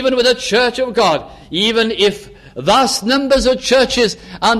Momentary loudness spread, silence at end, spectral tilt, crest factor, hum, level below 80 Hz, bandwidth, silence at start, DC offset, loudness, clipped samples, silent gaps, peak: 8 LU; 0 s; -3 dB/octave; 14 dB; none; -38 dBFS; 14.5 kHz; 0 s; under 0.1%; -14 LUFS; under 0.1%; none; -2 dBFS